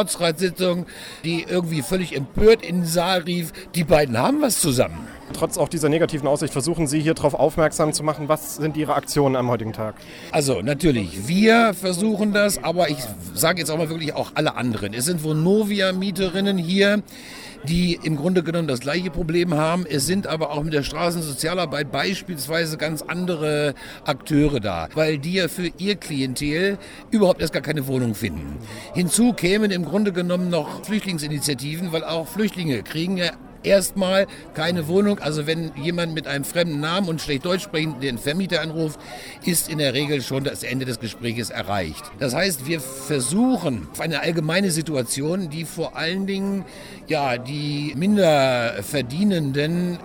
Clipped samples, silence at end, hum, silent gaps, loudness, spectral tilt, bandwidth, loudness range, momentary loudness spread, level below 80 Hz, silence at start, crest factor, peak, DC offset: under 0.1%; 0 s; none; none; -22 LUFS; -4.5 dB/octave; over 20 kHz; 4 LU; 8 LU; -44 dBFS; 0 s; 18 dB; -4 dBFS; under 0.1%